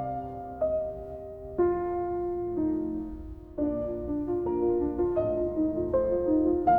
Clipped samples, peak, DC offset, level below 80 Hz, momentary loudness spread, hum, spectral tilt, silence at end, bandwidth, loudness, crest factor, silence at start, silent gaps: under 0.1%; -12 dBFS; under 0.1%; -46 dBFS; 12 LU; none; -11 dB/octave; 0 s; 3 kHz; -29 LUFS; 16 dB; 0 s; none